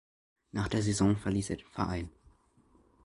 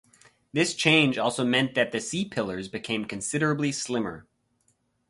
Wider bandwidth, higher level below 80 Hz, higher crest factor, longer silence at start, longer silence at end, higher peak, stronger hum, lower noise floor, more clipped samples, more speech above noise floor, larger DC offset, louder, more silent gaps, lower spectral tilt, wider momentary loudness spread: about the same, 11.5 kHz vs 11.5 kHz; first, -50 dBFS vs -62 dBFS; about the same, 20 dB vs 24 dB; about the same, 0.55 s vs 0.55 s; about the same, 0.95 s vs 0.9 s; second, -14 dBFS vs -4 dBFS; neither; second, -66 dBFS vs -70 dBFS; neither; second, 34 dB vs 44 dB; neither; second, -32 LUFS vs -26 LUFS; neither; first, -6 dB/octave vs -4 dB/octave; about the same, 11 LU vs 12 LU